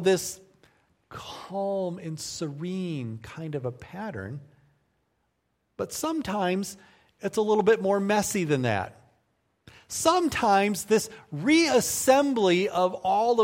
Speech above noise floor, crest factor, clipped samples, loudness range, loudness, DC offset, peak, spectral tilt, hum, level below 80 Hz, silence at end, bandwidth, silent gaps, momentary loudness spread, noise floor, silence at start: 50 dB; 20 dB; under 0.1%; 12 LU; -26 LUFS; under 0.1%; -6 dBFS; -4.5 dB/octave; none; -62 dBFS; 0 s; 16.5 kHz; none; 16 LU; -75 dBFS; 0 s